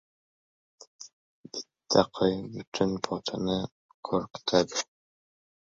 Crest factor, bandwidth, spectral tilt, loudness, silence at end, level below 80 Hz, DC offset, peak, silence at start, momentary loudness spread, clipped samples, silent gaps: 26 dB; 7.8 kHz; -4.5 dB/octave; -29 LUFS; 0.85 s; -60 dBFS; under 0.1%; -6 dBFS; 1 s; 19 LU; under 0.1%; 1.13-1.44 s, 2.67-2.72 s, 3.72-4.03 s